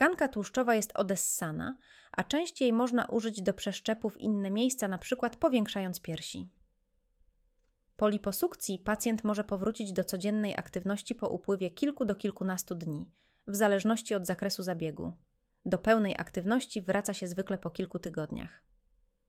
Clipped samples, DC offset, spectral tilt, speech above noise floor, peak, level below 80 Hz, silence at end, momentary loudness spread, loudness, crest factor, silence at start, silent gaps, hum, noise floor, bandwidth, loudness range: under 0.1%; under 0.1%; -4.5 dB/octave; 42 dB; -12 dBFS; -62 dBFS; 0.8 s; 10 LU; -32 LUFS; 22 dB; 0 s; none; none; -75 dBFS; 17 kHz; 4 LU